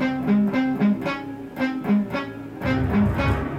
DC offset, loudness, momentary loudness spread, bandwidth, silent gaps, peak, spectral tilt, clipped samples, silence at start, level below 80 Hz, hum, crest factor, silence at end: under 0.1%; -23 LUFS; 9 LU; 7.2 kHz; none; -10 dBFS; -8 dB/octave; under 0.1%; 0 s; -38 dBFS; none; 12 dB; 0 s